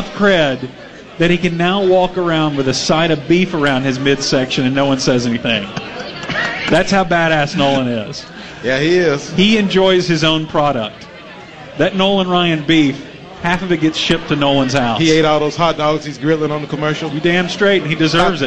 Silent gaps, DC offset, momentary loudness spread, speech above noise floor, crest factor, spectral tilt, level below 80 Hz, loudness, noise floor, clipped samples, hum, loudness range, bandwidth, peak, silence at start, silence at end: none; 0.8%; 12 LU; 20 dB; 14 dB; -5 dB/octave; -40 dBFS; -14 LUFS; -34 dBFS; under 0.1%; none; 2 LU; 9.2 kHz; 0 dBFS; 0 s; 0 s